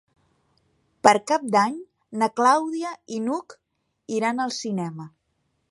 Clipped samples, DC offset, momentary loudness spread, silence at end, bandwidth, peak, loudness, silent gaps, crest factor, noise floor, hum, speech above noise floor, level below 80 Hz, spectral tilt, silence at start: under 0.1%; under 0.1%; 15 LU; 0.65 s; 11.5 kHz; 0 dBFS; -23 LUFS; none; 24 dB; -73 dBFS; none; 50 dB; -74 dBFS; -4.5 dB/octave; 1.05 s